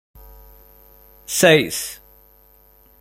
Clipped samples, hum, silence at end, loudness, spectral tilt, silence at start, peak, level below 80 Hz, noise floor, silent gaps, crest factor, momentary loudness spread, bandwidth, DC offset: under 0.1%; 50 Hz at -50 dBFS; 1.05 s; -17 LUFS; -3 dB/octave; 1.3 s; -2 dBFS; -50 dBFS; -52 dBFS; none; 22 dB; 27 LU; 16.5 kHz; under 0.1%